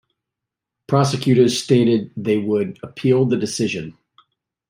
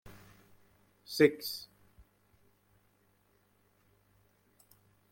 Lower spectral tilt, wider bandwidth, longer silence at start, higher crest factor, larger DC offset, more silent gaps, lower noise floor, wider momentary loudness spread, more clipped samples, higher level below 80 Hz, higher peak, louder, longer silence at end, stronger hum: about the same, -6 dB/octave vs -5 dB/octave; about the same, 16 kHz vs 16.5 kHz; first, 0.9 s vs 0.05 s; second, 18 dB vs 26 dB; neither; neither; first, -84 dBFS vs -71 dBFS; second, 8 LU vs 27 LU; neither; first, -60 dBFS vs -72 dBFS; first, -2 dBFS vs -12 dBFS; first, -19 LUFS vs -31 LUFS; second, 0.8 s vs 3.5 s; second, none vs 50 Hz at -75 dBFS